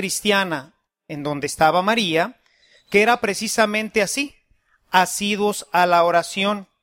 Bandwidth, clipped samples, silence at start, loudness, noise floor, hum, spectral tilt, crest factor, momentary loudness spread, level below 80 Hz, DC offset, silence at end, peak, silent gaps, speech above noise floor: 16.5 kHz; under 0.1%; 0 s; -20 LUFS; -62 dBFS; none; -3 dB/octave; 20 dB; 10 LU; -58 dBFS; under 0.1%; 0.2 s; 0 dBFS; none; 43 dB